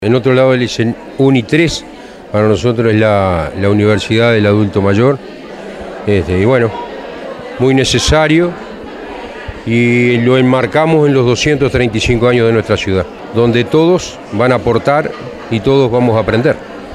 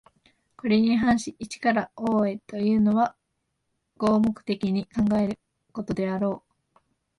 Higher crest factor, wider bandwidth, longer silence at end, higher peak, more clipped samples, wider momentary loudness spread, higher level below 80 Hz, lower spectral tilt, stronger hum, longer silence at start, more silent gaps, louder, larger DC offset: about the same, 12 dB vs 16 dB; first, 12.5 kHz vs 11 kHz; second, 0 s vs 0.8 s; first, 0 dBFS vs -10 dBFS; neither; first, 16 LU vs 11 LU; first, -34 dBFS vs -56 dBFS; about the same, -6 dB/octave vs -6.5 dB/octave; neither; second, 0 s vs 0.65 s; neither; first, -12 LUFS vs -25 LUFS; neither